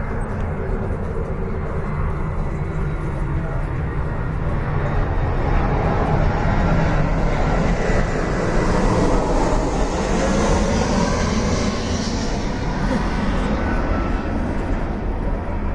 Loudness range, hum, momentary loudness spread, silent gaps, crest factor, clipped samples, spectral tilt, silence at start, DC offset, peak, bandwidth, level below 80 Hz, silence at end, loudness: 5 LU; none; 6 LU; none; 14 dB; under 0.1%; -6.5 dB/octave; 0 s; under 0.1%; -6 dBFS; 10.5 kHz; -24 dBFS; 0 s; -22 LUFS